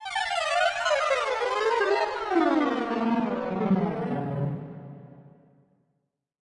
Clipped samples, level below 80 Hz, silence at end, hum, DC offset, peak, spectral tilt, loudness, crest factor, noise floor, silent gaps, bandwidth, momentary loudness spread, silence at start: under 0.1%; -62 dBFS; 1.25 s; none; under 0.1%; -12 dBFS; -5.5 dB/octave; -26 LUFS; 16 dB; -78 dBFS; none; 11.5 kHz; 9 LU; 0 s